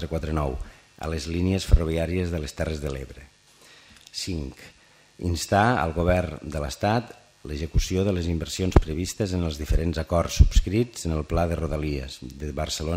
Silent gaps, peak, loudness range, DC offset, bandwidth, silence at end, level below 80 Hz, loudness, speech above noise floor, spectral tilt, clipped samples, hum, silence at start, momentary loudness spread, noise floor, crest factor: none; 0 dBFS; 5 LU; under 0.1%; 16 kHz; 0 s; -30 dBFS; -26 LUFS; 29 dB; -5.5 dB/octave; under 0.1%; none; 0 s; 15 LU; -53 dBFS; 24 dB